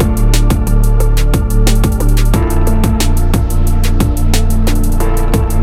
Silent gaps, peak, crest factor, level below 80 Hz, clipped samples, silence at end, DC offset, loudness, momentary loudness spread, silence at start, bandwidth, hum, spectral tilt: none; 0 dBFS; 10 dB; -10 dBFS; under 0.1%; 0 s; under 0.1%; -14 LUFS; 2 LU; 0 s; 15.5 kHz; none; -6 dB/octave